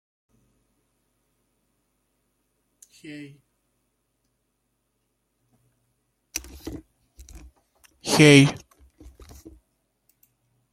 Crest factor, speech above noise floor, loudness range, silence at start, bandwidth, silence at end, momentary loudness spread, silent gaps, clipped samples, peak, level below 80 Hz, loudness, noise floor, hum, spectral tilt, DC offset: 26 dB; 57 dB; 20 LU; 3.1 s; 15.5 kHz; 2.2 s; 29 LU; none; under 0.1%; -2 dBFS; -56 dBFS; -18 LUFS; -75 dBFS; none; -5 dB/octave; under 0.1%